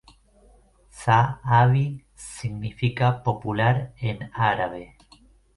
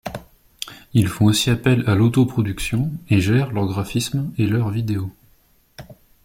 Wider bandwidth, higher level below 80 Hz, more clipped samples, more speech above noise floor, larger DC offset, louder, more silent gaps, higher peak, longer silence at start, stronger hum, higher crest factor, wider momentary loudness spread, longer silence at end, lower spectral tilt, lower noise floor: second, 11.5 kHz vs 16.5 kHz; second, -50 dBFS vs -44 dBFS; neither; second, 33 dB vs 38 dB; neither; second, -23 LUFS vs -20 LUFS; neither; about the same, -4 dBFS vs -4 dBFS; first, 0.95 s vs 0.05 s; neither; about the same, 20 dB vs 16 dB; second, 13 LU vs 16 LU; first, 0.7 s vs 0.3 s; about the same, -6.5 dB/octave vs -6 dB/octave; about the same, -56 dBFS vs -57 dBFS